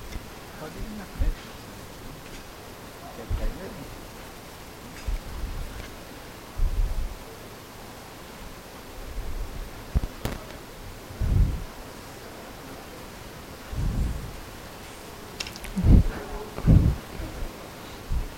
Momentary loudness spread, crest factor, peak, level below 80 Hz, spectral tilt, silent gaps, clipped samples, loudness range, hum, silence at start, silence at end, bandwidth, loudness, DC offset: 16 LU; 24 dB; -4 dBFS; -32 dBFS; -6 dB/octave; none; under 0.1%; 12 LU; none; 0 s; 0 s; 16.5 kHz; -32 LUFS; under 0.1%